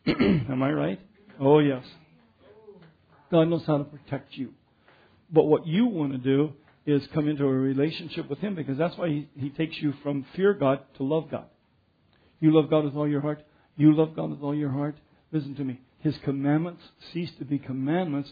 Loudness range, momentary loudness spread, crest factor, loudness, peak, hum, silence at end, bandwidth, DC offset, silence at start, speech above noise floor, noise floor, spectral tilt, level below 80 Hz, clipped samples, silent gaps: 5 LU; 13 LU; 20 dB; -26 LUFS; -6 dBFS; none; 0 s; 5 kHz; under 0.1%; 0.05 s; 41 dB; -66 dBFS; -10 dB/octave; -60 dBFS; under 0.1%; none